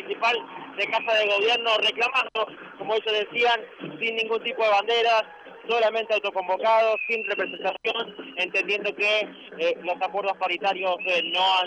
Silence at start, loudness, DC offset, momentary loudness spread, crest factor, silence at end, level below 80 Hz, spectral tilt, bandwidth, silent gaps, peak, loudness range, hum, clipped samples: 0 s; -24 LUFS; under 0.1%; 8 LU; 14 dB; 0 s; -76 dBFS; -2.5 dB/octave; 9.2 kHz; none; -12 dBFS; 2 LU; none; under 0.1%